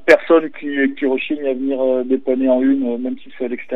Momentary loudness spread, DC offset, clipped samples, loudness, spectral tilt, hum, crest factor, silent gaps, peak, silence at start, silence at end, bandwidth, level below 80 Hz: 11 LU; 2%; under 0.1%; -18 LUFS; -5.5 dB/octave; none; 18 dB; none; 0 dBFS; 0.05 s; 0 s; 8.2 kHz; -64 dBFS